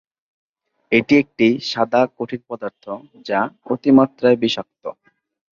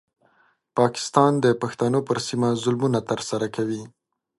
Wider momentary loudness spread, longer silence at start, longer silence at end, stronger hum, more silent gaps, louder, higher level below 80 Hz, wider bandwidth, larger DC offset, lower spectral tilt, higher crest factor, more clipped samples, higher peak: first, 18 LU vs 9 LU; first, 0.9 s vs 0.75 s; first, 0.65 s vs 0.5 s; neither; neither; first, -18 LUFS vs -23 LUFS; about the same, -60 dBFS vs -62 dBFS; second, 7.2 kHz vs 11.5 kHz; neither; about the same, -6 dB/octave vs -5.5 dB/octave; about the same, 18 dB vs 22 dB; neither; about the same, -2 dBFS vs -2 dBFS